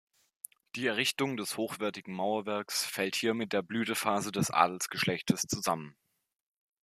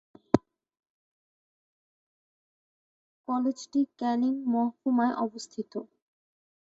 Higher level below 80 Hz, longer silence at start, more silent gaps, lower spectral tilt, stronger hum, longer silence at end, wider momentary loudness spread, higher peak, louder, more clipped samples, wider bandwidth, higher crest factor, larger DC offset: about the same, -72 dBFS vs -68 dBFS; first, 0.75 s vs 0.35 s; second, none vs 0.90-3.24 s; second, -3.5 dB/octave vs -6 dB/octave; neither; about the same, 0.9 s vs 0.8 s; second, 8 LU vs 12 LU; second, -8 dBFS vs -4 dBFS; second, -32 LUFS vs -29 LUFS; neither; first, 15 kHz vs 7.8 kHz; about the same, 24 dB vs 28 dB; neither